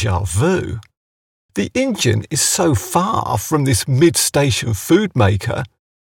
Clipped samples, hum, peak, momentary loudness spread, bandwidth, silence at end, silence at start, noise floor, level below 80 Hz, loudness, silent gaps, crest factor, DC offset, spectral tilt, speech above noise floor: under 0.1%; none; -2 dBFS; 10 LU; 19 kHz; 0.35 s; 0 s; under -90 dBFS; -40 dBFS; -16 LUFS; 0.97-1.49 s; 14 dB; under 0.1%; -4.5 dB/octave; over 74 dB